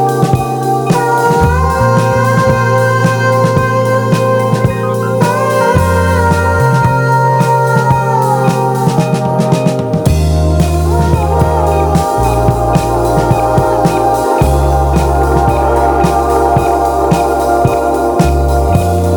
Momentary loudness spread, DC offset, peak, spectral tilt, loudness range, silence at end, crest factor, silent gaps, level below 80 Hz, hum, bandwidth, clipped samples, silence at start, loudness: 2 LU; under 0.1%; 0 dBFS; -6.5 dB/octave; 1 LU; 0 s; 10 dB; none; -20 dBFS; none; over 20 kHz; under 0.1%; 0 s; -11 LUFS